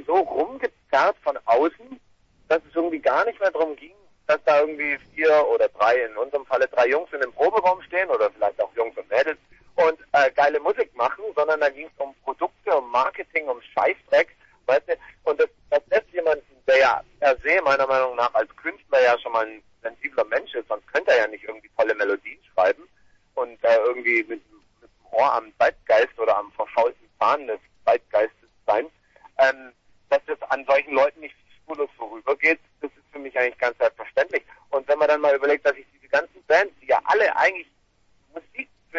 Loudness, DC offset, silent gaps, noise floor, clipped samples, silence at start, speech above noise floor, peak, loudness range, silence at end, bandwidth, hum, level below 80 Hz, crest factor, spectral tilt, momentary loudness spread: -22 LUFS; under 0.1%; none; -62 dBFS; under 0.1%; 0 s; 40 dB; -6 dBFS; 3 LU; 0 s; 7.4 kHz; none; -62 dBFS; 18 dB; -3.5 dB/octave; 12 LU